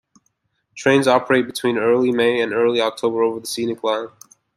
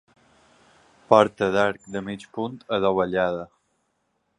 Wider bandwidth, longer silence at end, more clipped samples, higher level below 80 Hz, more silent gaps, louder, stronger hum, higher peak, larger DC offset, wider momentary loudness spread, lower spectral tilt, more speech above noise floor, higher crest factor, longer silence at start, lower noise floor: first, 14.5 kHz vs 10.5 kHz; second, 0.5 s vs 0.95 s; neither; second, -64 dBFS vs -58 dBFS; neither; first, -19 LUFS vs -23 LUFS; neither; about the same, -2 dBFS vs 0 dBFS; neither; second, 8 LU vs 15 LU; second, -4.5 dB/octave vs -6 dB/octave; about the same, 51 dB vs 50 dB; second, 18 dB vs 24 dB; second, 0.75 s vs 1.1 s; second, -69 dBFS vs -73 dBFS